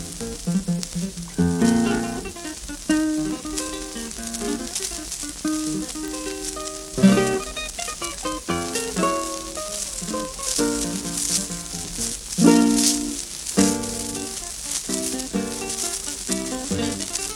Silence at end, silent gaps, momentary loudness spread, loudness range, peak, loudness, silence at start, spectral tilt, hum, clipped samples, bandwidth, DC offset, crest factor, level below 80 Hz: 0 s; none; 11 LU; 6 LU; -2 dBFS; -24 LUFS; 0 s; -3.5 dB/octave; none; under 0.1%; 18 kHz; under 0.1%; 22 dB; -44 dBFS